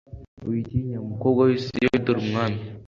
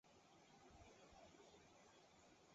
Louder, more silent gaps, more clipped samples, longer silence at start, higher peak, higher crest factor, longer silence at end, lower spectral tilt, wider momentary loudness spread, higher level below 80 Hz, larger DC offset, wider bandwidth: first, -24 LUFS vs -68 LUFS; first, 0.28-0.37 s vs none; neither; about the same, 0.1 s vs 0.05 s; first, -6 dBFS vs -54 dBFS; about the same, 18 dB vs 14 dB; about the same, 0 s vs 0 s; first, -8 dB/octave vs -3.5 dB/octave; first, 9 LU vs 3 LU; first, -48 dBFS vs -82 dBFS; neither; about the same, 7.2 kHz vs 7.6 kHz